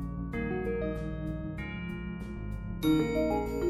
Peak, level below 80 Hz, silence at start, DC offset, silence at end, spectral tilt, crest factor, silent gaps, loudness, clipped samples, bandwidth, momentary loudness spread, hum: -16 dBFS; -42 dBFS; 0 s; under 0.1%; 0 s; -7.5 dB/octave; 16 dB; none; -33 LUFS; under 0.1%; 14 kHz; 11 LU; none